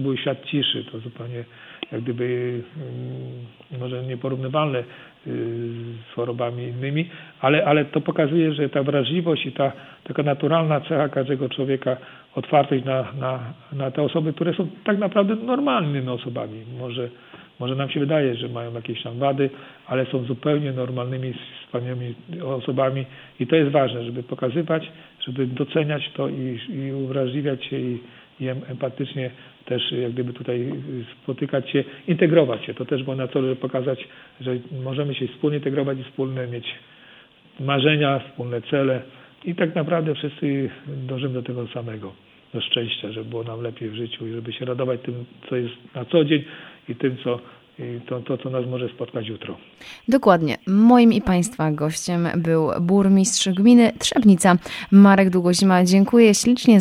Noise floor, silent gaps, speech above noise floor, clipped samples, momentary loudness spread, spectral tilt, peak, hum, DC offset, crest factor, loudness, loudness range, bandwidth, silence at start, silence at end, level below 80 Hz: -50 dBFS; none; 28 dB; under 0.1%; 17 LU; -5.5 dB/octave; -2 dBFS; none; under 0.1%; 20 dB; -22 LUFS; 10 LU; 14 kHz; 0 s; 0 s; -58 dBFS